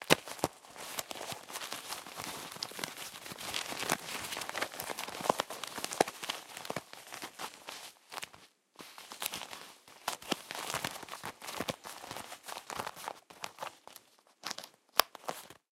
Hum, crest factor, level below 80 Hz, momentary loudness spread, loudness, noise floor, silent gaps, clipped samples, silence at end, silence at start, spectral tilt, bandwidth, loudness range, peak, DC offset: none; 40 dB; -72 dBFS; 13 LU; -39 LUFS; -61 dBFS; none; under 0.1%; 0.2 s; 0 s; -2 dB/octave; 16.5 kHz; 7 LU; 0 dBFS; under 0.1%